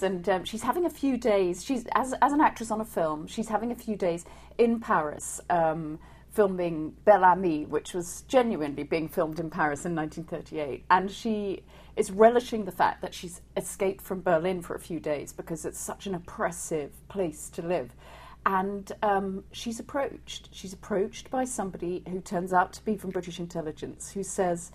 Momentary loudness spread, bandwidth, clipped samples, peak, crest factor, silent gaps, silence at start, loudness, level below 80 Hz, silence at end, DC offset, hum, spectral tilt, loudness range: 12 LU; 15 kHz; under 0.1%; -8 dBFS; 22 dB; none; 0 s; -29 LUFS; -54 dBFS; 0 s; under 0.1%; none; -5 dB/octave; 6 LU